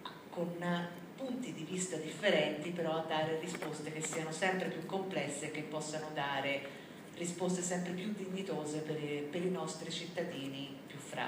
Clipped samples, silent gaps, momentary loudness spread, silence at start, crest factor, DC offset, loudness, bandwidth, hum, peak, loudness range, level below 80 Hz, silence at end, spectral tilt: under 0.1%; none; 8 LU; 0 s; 20 dB; under 0.1%; -38 LUFS; 15.5 kHz; none; -18 dBFS; 3 LU; -80 dBFS; 0 s; -4 dB/octave